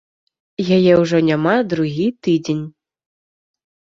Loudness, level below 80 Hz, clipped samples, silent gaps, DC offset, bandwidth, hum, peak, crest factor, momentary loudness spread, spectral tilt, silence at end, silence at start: -17 LUFS; -56 dBFS; under 0.1%; none; under 0.1%; 7.6 kHz; none; -2 dBFS; 16 dB; 12 LU; -7 dB/octave; 1.1 s; 0.6 s